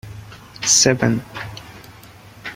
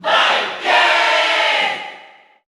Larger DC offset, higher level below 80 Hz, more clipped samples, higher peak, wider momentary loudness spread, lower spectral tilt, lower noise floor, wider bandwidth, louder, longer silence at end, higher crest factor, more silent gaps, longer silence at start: neither; first, -50 dBFS vs -70 dBFS; neither; about the same, -2 dBFS vs -2 dBFS; first, 25 LU vs 9 LU; first, -2.5 dB/octave vs 0 dB/octave; about the same, -43 dBFS vs -44 dBFS; first, 16.5 kHz vs 13.5 kHz; about the same, -16 LUFS vs -14 LUFS; second, 0 s vs 0.4 s; first, 20 dB vs 14 dB; neither; about the same, 0.05 s vs 0 s